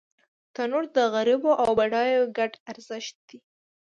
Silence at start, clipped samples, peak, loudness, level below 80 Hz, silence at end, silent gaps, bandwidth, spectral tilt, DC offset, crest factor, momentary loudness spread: 0.6 s; under 0.1%; -8 dBFS; -24 LUFS; -66 dBFS; 0.45 s; 2.60-2.66 s, 3.15-3.28 s; 9.4 kHz; -4 dB/octave; under 0.1%; 16 dB; 16 LU